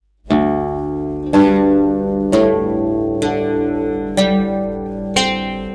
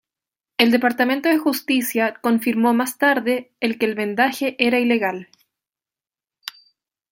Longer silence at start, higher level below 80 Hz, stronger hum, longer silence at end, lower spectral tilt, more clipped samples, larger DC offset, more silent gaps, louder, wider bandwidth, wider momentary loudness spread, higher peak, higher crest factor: second, 0.25 s vs 0.6 s; first, -38 dBFS vs -68 dBFS; first, 50 Hz at -40 dBFS vs none; second, 0 s vs 0.6 s; first, -5.5 dB/octave vs -3.5 dB/octave; neither; neither; neither; about the same, -17 LUFS vs -19 LUFS; second, 11 kHz vs 17 kHz; about the same, 9 LU vs 11 LU; about the same, -4 dBFS vs -2 dBFS; second, 12 dB vs 20 dB